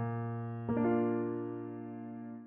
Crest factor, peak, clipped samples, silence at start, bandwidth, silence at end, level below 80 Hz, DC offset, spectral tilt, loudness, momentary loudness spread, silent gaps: 14 dB; -22 dBFS; under 0.1%; 0 s; 3.3 kHz; 0 s; -70 dBFS; under 0.1%; -10 dB/octave; -36 LUFS; 13 LU; none